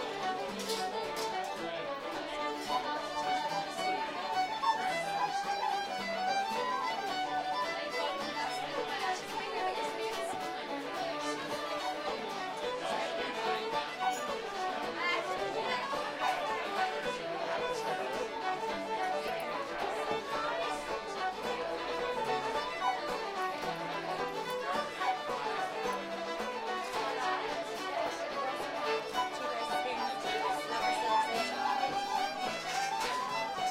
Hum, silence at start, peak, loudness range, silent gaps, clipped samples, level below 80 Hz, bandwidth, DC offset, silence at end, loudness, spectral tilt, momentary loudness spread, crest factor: none; 0 s; -18 dBFS; 3 LU; none; under 0.1%; -66 dBFS; 16 kHz; under 0.1%; 0 s; -35 LUFS; -2.5 dB/octave; 4 LU; 18 dB